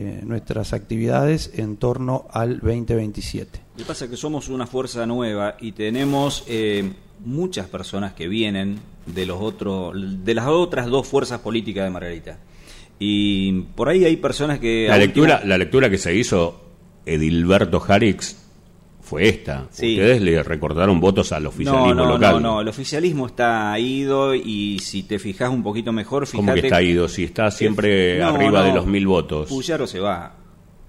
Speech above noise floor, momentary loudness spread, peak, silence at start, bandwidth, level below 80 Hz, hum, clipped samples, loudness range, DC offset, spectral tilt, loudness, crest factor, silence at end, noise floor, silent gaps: 28 dB; 12 LU; -4 dBFS; 0 s; 15.5 kHz; -40 dBFS; none; under 0.1%; 8 LU; under 0.1%; -5.5 dB/octave; -20 LUFS; 16 dB; 0.05 s; -48 dBFS; none